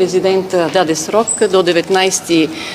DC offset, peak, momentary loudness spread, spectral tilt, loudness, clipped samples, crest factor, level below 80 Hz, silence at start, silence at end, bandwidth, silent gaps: under 0.1%; 0 dBFS; 2 LU; -3.5 dB/octave; -13 LUFS; under 0.1%; 14 dB; -54 dBFS; 0 s; 0 s; 15.5 kHz; none